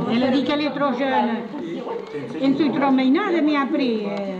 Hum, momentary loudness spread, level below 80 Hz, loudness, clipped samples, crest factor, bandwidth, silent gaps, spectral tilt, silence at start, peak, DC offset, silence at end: none; 11 LU; -62 dBFS; -21 LUFS; under 0.1%; 12 dB; 7.4 kHz; none; -6.5 dB/octave; 0 s; -8 dBFS; under 0.1%; 0 s